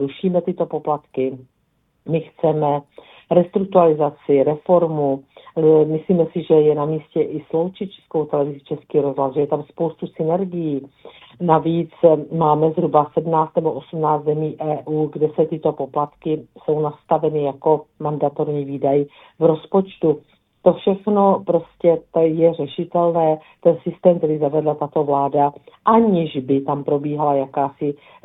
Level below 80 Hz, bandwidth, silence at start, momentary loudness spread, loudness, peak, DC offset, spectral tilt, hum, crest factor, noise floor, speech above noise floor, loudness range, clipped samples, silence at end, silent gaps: -62 dBFS; 4 kHz; 0 s; 9 LU; -19 LUFS; 0 dBFS; under 0.1%; -11.5 dB/octave; none; 18 dB; -53 dBFS; 35 dB; 4 LU; under 0.1%; 0.3 s; none